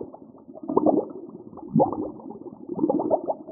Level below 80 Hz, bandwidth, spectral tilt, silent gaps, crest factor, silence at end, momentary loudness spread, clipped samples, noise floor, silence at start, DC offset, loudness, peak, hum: -64 dBFS; 1.5 kHz; -13 dB/octave; none; 22 dB; 0 s; 19 LU; under 0.1%; -45 dBFS; 0 s; under 0.1%; -25 LUFS; -4 dBFS; none